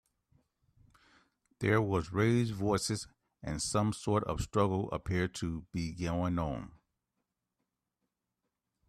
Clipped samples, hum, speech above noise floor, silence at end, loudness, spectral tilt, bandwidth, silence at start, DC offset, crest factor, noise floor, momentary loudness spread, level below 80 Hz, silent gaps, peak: under 0.1%; none; 54 dB; 2.2 s; -33 LUFS; -5.5 dB/octave; 13.5 kHz; 1.6 s; under 0.1%; 20 dB; -87 dBFS; 10 LU; -54 dBFS; none; -16 dBFS